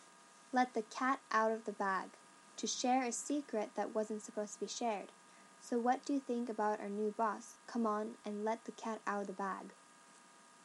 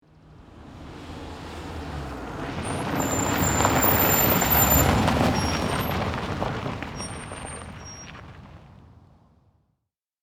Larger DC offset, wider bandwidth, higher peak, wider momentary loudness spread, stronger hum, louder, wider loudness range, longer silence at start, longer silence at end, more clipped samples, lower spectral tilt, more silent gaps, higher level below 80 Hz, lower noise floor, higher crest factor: neither; second, 12 kHz vs 19.5 kHz; second, -20 dBFS vs -6 dBFS; second, 10 LU vs 21 LU; neither; second, -39 LUFS vs -23 LUFS; second, 3 LU vs 16 LU; second, 0 s vs 0.3 s; second, 0 s vs 1.35 s; neither; about the same, -3.5 dB/octave vs -4 dB/octave; neither; second, under -90 dBFS vs -40 dBFS; second, -62 dBFS vs -80 dBFS; about the same, 18 dB vs 20 dB